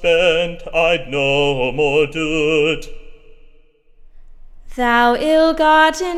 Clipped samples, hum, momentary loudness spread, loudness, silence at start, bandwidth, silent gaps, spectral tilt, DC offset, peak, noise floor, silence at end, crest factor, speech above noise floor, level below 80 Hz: under 0.1%; none; 7 LU; -15 LUFS; 0 s; 14.5 kHz; none; -4.5 dB/octave; under 0.1%; -2 dBFS; -48 dBFS; 0 s; 14 dB; 32 dB; -36 dBFS